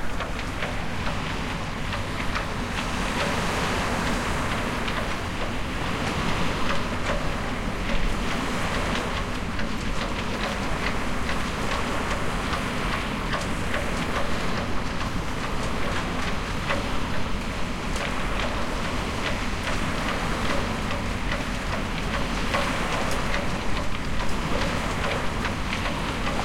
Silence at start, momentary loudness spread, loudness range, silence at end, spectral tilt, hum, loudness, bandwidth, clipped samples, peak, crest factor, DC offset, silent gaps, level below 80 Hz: 0 s; 4 LU; 2 LU; 0 s; -4.5 dB/octave; none; -27 LUFS; 16.5 kHz; under 0.1%; -12 dBFS; 14 dB; under 0.1%; none; -34 dBFS